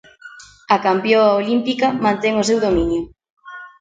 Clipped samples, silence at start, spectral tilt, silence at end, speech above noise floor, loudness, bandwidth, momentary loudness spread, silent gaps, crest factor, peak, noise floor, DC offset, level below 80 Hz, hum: under 0.1%; 0.25 s; -5 dB/octave; 0.1 s; 25 dB; -17 LUFS; 9.4 kHz; 21 LU; 3.30-3.37 s; 18 dB; 0 dBFS; -41 dBFS; under 0.1%; -42 dBFS; none